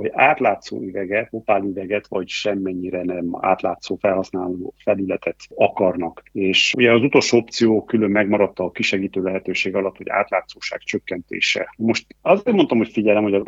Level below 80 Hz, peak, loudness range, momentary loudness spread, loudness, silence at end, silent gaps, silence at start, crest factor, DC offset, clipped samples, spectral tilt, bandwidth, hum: -60 dBFS; 0 dBFS; 5 LU; 11 LU; -20 LUFS; 0 s; none; 0 s; 20 dB; under 0.1%; under 0.1%; -4.5 dB/octave; 8 kHz; none